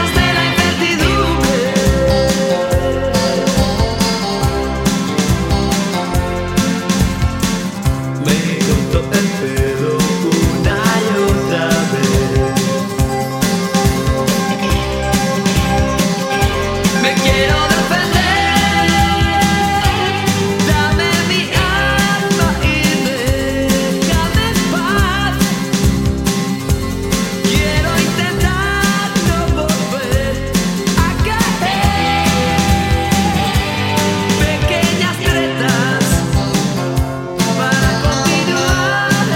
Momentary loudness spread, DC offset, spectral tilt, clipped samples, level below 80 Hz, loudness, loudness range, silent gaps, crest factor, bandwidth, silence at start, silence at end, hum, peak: 4 LU; under 0.1%; -4.5 dB/octave; under 0.1%; -24 dBFS; -14 LUFS; 3 LU; none; 14 dB; 16.5 kHz; 0 s; 0 s; none; 0 dBFS